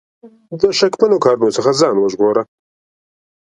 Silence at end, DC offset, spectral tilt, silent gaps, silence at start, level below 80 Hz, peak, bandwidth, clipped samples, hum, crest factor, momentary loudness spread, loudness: 0.95 s; under 0.1%; -4.5 dB/octave; none; 0.25 s; -58 dBFS; 0 dBFS; 11 kHz; under 0.1%; none; 16 dB; 7 LU; -14 LUFS